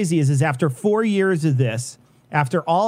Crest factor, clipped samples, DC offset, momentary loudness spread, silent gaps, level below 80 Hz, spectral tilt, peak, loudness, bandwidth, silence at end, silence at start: 18 dB; under 0.1%; under 0.1%; 6 LU; none; -64 dBFS; -6.5 dB/octave; -2 dBFS; -20 LUFS; 14.5 kHz; 0 s; 0 s